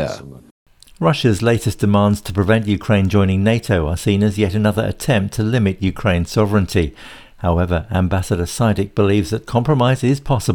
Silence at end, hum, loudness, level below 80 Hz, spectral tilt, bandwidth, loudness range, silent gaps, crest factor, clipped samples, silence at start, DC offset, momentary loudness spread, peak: 0 s; none; -17 LUFS; -38 dBFS; -6.5 dB/octave; 18.5 kHz; 2 LU; 0.51-0.66 s; 14 dB; under 0.1%; 0 s; under 0.1%; 5 LU; -2 dBFS